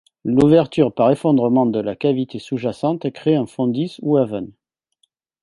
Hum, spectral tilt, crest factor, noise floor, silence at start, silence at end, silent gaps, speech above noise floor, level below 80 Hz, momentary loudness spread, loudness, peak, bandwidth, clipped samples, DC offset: none; -8.5 dB/octave; 16 dB; -67 dBFS; 0.25 s; 0.9 s; none; 49 dB; -54 dBFS; 10 LU; -18 LUFS; -2 dBFS; 11.5 kHz; under 0.1%; under 0.1%